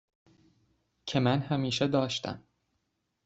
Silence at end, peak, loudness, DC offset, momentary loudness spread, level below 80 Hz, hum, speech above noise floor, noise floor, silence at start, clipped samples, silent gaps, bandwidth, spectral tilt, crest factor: 0.85 s; -12 dBFS; -30 LUFS; under 0.1%; 14 LU; -66 dBFS; none; 51 dB; -79 dBFS; 1.05 s; under 0.1%; none; 8.2 kHz; -5.5 dB/octave; 20 dB